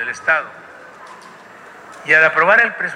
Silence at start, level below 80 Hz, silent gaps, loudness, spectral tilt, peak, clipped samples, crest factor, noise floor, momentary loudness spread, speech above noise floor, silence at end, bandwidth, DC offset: 0 s; -64 dBFS; none; -13 LUFS; -3.5 dB/octave; -2 dBFS; under 0.1%; 16 dB; -40 dBFS; 17 LU; 25 dB; 0 s; 11 kHz; under 0.1%